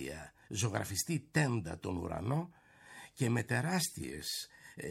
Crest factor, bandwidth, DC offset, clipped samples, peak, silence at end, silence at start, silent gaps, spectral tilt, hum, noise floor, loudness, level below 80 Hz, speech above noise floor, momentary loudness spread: 20 dB; 16.5 kHz; under 0.1%; under 0.1%; -16 dBFS; 0 s; 0 s; none; -4.5 dB/octave; none; -56 dBFS; -36 LUFS; -62 dBFS; 20 dB; 16 LU